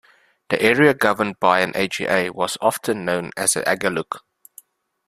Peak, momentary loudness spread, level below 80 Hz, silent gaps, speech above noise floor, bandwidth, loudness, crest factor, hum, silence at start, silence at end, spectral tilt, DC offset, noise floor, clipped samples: 0 dBFS; 9 LU; -60 dBFS; none; 30 dB; 15.5 kHz; -19 LUFS; 20 dB; none; 0.5 s; 0.9 s; -3.5 dB/octave; under 0.1%; -50 dBFS; under 0.1%